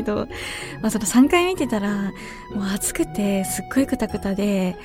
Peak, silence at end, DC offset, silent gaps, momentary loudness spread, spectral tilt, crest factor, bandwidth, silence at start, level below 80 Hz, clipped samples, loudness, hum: -4 dBFS; 0 s; under 0.1%; none; 12 LU; -4.5 dB/octave; 18 dB; 17 kHz; 0 s; -44 dBFS; under 0.1%; -22 LUFS; none